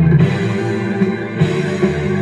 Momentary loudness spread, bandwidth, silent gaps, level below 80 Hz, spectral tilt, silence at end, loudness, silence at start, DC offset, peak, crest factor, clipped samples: 5 LU; 10 kHz; none; -40 dBFS; -8 dB/octave; 0 s; -17 LUFS; 0 s; under 0.1%; -2 dBFS; 14 dB; under 0.1%